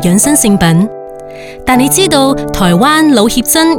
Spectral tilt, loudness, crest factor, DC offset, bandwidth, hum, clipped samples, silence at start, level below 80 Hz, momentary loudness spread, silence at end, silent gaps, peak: -4 dB/octave; -9 LUFS; 10 dB; under 0.1%; over 20 kHz; none; 0.2%; 0 s; -32 dBFS; 17 LU; 0 s; none; 0 dBFS